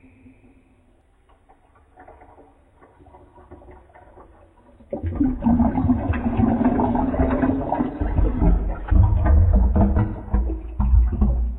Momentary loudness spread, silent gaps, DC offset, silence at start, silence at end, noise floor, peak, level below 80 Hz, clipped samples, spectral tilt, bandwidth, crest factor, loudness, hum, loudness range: 7 LU; none; under 0.1%; 2 s; 0 s; -57 dBFS; -4 dBFS; -24 dBFS; under 0.1%; -12.5 dB/octave; 3.5 kHz; 16 dB; -21 LUFS; none; 7 LU